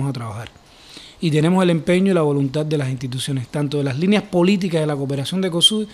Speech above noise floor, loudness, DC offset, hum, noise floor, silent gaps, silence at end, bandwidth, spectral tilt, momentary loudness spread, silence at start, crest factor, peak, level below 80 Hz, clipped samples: 23 dB; -19 LUFS; under 0.1%; none; -42 dBFS; none; 0 s; 13.5 kHz; -5.5 dB/octave; 12 LU; 0 s; 18 dB; -2 dBFS; -54 dBFS; under 0.1%